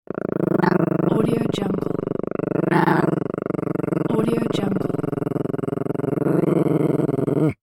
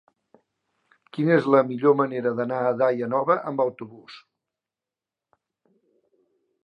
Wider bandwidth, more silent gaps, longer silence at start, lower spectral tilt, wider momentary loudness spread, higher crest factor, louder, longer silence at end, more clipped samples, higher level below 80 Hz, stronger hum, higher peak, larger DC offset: first, 17 kHz vs 5.8 kHz; neither; second, 0.25 s vs 1.15 s; about the same, -8.5 dB/octave vs -9 dB/octave; second, 6 LU vs 18 LU; about the same, 18 dB vs 20 dB; about the same, -21 LUFS vs -22 LUFS; second, 0.2 s vs 2.45 s; neither; first, -52 dBFS vs -80 dBFS; neither; about the same, -2 dBFS vs -4 dBFS; neither